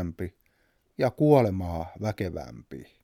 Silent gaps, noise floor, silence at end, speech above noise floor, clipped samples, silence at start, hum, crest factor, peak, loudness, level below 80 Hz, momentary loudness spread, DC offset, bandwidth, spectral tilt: none; -69 dBFS; 0.2 s; 42 dB; under 0.1%; 0 s; none; 22 dB; -6 dBFS; -26 LUFS; -50 dBFS; 22 LU; under 0.1%; 16 kHz; -8.5 dB/octave